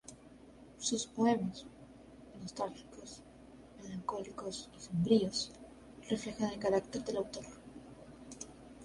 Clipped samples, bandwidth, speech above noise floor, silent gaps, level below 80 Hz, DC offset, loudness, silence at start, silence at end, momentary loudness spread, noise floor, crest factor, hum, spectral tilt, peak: under 0.1%; 11.5 kHz; 21 dB; none; -64 dBFS; under 0.1%; -36 LUFS; 0.05 s; 0 s; 24 LU; -57 dBFS; 22 dB; none; -5 dB/octave; -16 dBFS